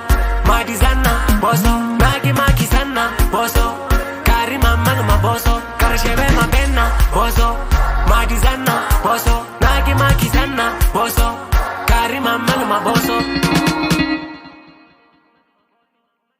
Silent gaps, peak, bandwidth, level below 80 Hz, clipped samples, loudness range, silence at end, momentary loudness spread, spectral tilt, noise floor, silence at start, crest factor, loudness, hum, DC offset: none; 0 dBFS; 16.5 kHz; -18 dBFS; under 0.1%; 2 LU; 1.9 s; 4 LU; -5 dB/octave; -68 dBFS; 0 s; 14 dB; -16 LUFS; none; under 0.1%